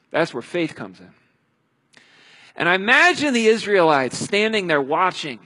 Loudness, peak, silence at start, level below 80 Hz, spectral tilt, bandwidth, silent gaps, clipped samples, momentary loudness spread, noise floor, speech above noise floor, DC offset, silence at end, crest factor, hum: -18 LUFS; -2 dBFS; 0.15 s; -66 dBFS; -3.5 dB/octave; 11.5 kHz; none; under 0.1%; 12 LU; -67 dBFS; 48 dB; under 0.1%; 0.1 s; 18 dB; none